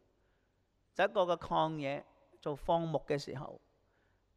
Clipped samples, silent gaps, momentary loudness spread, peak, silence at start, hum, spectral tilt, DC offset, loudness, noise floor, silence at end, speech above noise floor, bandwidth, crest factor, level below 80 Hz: under 0.1%; none; 13 LU; -18 dBFS; 0.95 s; none; -6 dB/octave; under 0.1%; -35 LUFS; -76 dBFS; 0.8 s; 41 dB; 12.5 kHz; 18 dB; -62 dBFS